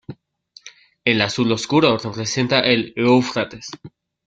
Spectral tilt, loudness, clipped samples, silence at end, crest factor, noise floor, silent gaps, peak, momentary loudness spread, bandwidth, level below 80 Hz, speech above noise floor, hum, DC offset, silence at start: -4.5 dB/octave; -18 LUFS; under 0.1%; 0.4 s; 18 dB; -51 dBFS; none; -2 dBFS; 12 LU; 9 kHz; -56 dBFS; 33 dB; none; under 0.1%; 0.1 s